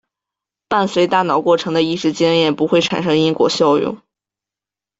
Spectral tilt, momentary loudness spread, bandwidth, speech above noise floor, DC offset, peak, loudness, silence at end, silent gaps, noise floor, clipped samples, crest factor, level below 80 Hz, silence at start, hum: -5 dB/octave; 4 LU; 7.8 kHz; 73 dB; under 0.1%; -2 dBFS; -16 LUFS; 1.05 s; none; -88 dBFS; under 0.1%; 14 dB; -58 dBFS; 0.7 s; none